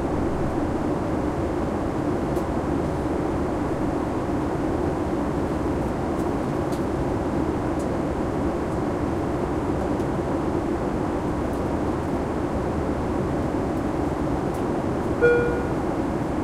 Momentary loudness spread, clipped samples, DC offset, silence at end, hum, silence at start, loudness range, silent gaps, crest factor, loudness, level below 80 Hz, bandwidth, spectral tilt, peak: 1 LU; under 0.1%; under 0.1%; 0 s; none; 0 s; 2 LU; none; 18 dB; -25 LUFS; -36 dBFS; 15 kHz; -7.5 dB/octave; -6 dBFS